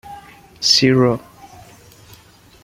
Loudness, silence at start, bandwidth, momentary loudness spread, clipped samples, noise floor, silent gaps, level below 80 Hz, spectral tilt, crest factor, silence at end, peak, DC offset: -15 LUFS; 0.05 s; 16 kHz; 16 LU; under 0.1%; -47 dBFS; none; -54 dBFS; -4 dB/octave; 20 dB; 1.45 s; 0 dBFS; under 0.1%